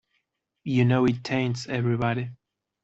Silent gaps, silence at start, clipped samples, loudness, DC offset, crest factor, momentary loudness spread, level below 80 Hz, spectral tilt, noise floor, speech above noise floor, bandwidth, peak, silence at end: none; 0.65 s; under 0.1%; -25 LUFS; under 0.1%; 18 dB; 11 LU; -60 dBFS; -7 dB/octave; -77 dBFS; 53 dB; 8 kHz; -8 dBFS; 0.5 s